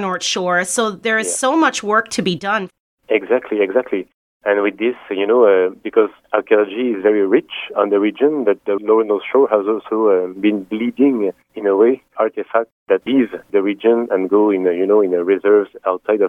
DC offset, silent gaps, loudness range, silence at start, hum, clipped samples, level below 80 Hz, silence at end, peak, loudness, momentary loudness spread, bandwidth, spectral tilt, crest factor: under 0.1%; 2.80-2.98 s, 4.14-4.40 s, 12.72-12.86 s; 2 LU; 0 s; none; under 0.1%; -66 dBFS; 0 s; 0 dBFS; -17 LUFS; 7 LU; 13 kHz; -4 dB/octave; 16 dB